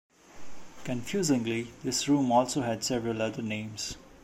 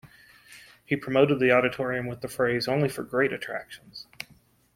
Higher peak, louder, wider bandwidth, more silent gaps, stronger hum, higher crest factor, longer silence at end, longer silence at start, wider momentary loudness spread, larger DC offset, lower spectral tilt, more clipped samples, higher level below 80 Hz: second, -12 dBFS vs -8 dBFS; second, -30 LUFS vs -26 LUFS; about the same, 16 kHz vs 16.5 kHz; neither; neither; about the same, 20 dB vs 20 dB; second, 0.05 s vs 0.5 s; first, 0.35 s vs 0.05 s; second, 11 LU vs 21 LU; neither; second, -4.5 dB/octave vs -6 dB/octave; neither; about the same, -58 dBFS vs -62 dBFS